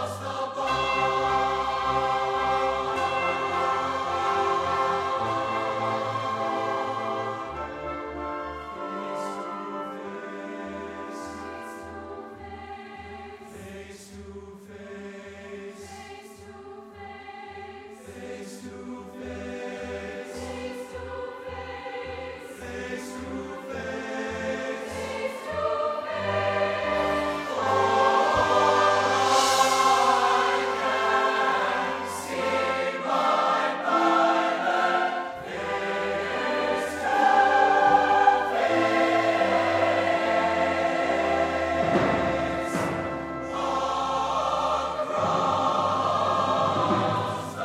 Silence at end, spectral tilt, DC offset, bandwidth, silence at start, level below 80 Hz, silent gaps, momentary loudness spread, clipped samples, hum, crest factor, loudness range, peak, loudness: 0 s; -4 dB/octave; under 0.1%; 16 kHz; 0 s; -54 dBFS; none; 20 LU; under 0.1%; none; 20 dB; 19 LU; -6 dBFS; -25 LUFS